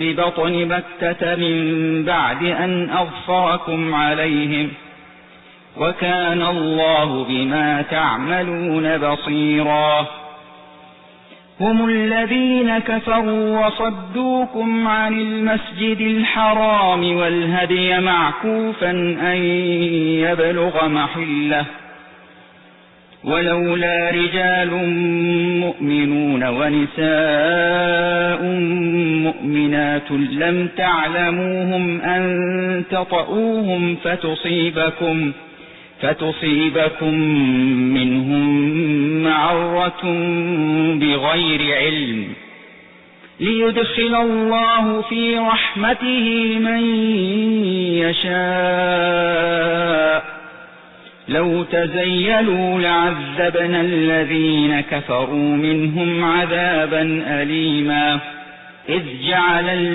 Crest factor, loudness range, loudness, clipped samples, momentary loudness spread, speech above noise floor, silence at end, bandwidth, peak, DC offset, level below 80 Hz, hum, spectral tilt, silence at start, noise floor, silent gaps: 12 dB; 3 LU; -17 LUFS; under 0.1%; 5 LU; 30 dB; 0 s; 4.1 kHz; -6 dBFS; under 0.1%; -50 dBFS; none; -10.5 dB/octave; 0 s; -47 dBFS; none